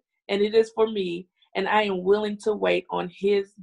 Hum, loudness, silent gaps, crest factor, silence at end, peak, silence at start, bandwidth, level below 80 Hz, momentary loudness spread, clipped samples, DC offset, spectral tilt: none; -24 LUFS; none; 16 dB; 0 s; -8 dBFS; 0.3 s; 10.5 kHz; -64 dBFS; 9 LU; under 0.1%; under 0.1%; -5.5 dB/octave